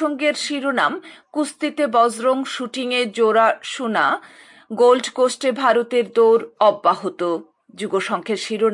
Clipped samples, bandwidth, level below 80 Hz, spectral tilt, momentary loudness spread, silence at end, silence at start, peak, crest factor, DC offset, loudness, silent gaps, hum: under 0.1%; 11.5 kHz; -76 dBFS; -3.5 dB/octave; 10 LU; 0 s; 0 s; -4 dBFS; 16 dB; under 0.1%; -19 LUFS; none; none